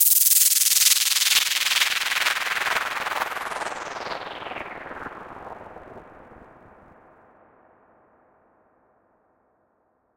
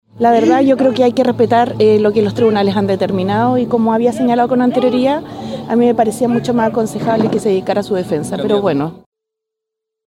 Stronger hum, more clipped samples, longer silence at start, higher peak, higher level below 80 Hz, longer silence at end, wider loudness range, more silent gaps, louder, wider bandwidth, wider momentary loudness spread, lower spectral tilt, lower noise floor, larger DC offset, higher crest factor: neither; neither; second, 0 s vs 0.15 s; about the same, -2 dBFS vs -2 dBFS; second, -64 dBFS vs -52 dBFS; first, 3.7 s vs 1.1 s; first, 23 LU vs 4 LU; neither; second, -19 LUFS vs -14 LUFS; first, 17.5 kHz vs 13.5 kHz; first, 23 LU vs 6 LU; second, 2 dB/octave vs -6.5 dB/octave; second, -68 dBFS vs -80 dBFS; neither; first, 24 dB vs 12 dB